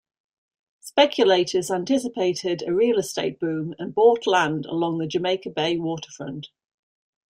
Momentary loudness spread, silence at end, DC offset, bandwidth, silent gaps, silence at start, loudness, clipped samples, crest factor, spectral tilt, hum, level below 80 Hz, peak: 11 LU; 0.85 s; under 0.1%; 16 kHz; none; 0.85 s; -22 LUFS; under 0.1%; 20 dB; -4.5 dB/octave; none; -66 dBFS; -4 dBFS